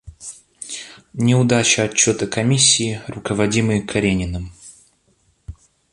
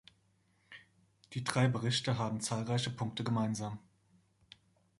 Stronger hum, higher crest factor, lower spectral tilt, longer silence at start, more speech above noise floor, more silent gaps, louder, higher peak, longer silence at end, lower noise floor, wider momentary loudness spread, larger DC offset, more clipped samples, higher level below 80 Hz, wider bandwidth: neither; second, 20 dB vs 26 dB; second, -3.5 dB/octave vs -5 dB/octave; second, 0.05 s vs 0.7 s; first, 44 dB vs 39 dB; neither; first, -17 LUFS vs -35 LUFS; first, 0 dBFS vs -12 dBFS; second, 0.4 s vs 1.2 s; second, -61 dBFS vs -73 dBFS; about the same, 21 LU vs 23 LU; neither; neither; first, -42 dBFS vs -68 dBFS; about the same, 11.5 kHz vs 11.5 kHz